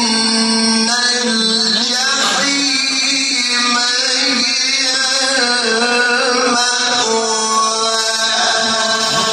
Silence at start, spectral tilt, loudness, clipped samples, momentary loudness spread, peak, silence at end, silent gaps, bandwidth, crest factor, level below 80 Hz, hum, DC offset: 0 s; -0.5 dB/octave; -12 LUFS; under 0.1%; 1 LU; -2 dBFS; 0 s; none; 15.5 kHz; 12 dB; -64 dBFS; none; under 0.1%